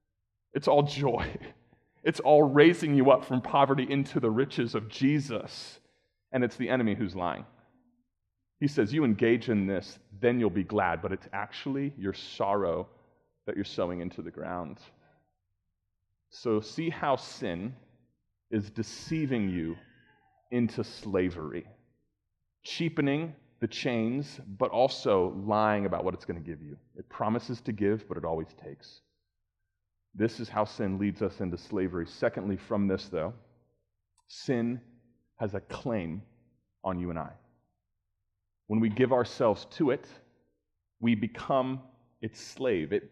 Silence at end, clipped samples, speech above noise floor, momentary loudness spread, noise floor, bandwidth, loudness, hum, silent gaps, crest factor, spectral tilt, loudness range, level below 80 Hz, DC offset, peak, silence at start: 0.05 s; under 0.1%; 53 dB; 15 LU; -82 dBFS; 11 kHz; -30 LUFS; none; none; 24 dB; -7 dB/octave; 11 LU; -62 dBFS; under 0.1%; -6 dBFS; 0.55 s